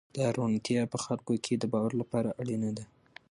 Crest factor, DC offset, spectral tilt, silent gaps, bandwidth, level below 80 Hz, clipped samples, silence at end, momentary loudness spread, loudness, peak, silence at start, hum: 18 dB; under 0.1%; -6 dB/octave; none; 11.5 kHz; -68 dBFS; under 0.1%; 0.45 s; 5 LU; -32 LUFS; -14 dBFS; 0.15 s; none